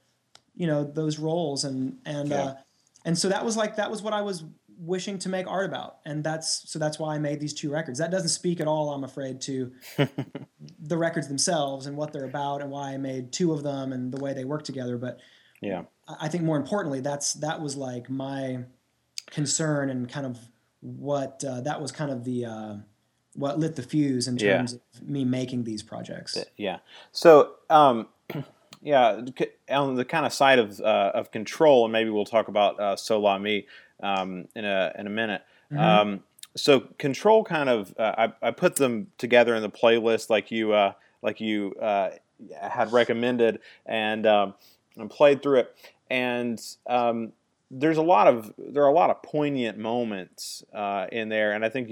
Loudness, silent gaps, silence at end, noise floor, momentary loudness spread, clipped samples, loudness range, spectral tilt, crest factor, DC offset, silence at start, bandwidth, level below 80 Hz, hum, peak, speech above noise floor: -25 LUFS; none; 0 s; -61 dBFS; 15 LU; under 0.1%; 8 LU; -4.5 dB/octave; 24 dB; under 0.1%; 0.6 s; 17.5 kHz; -78 dBFS; none; -2 dBFS; 36 dB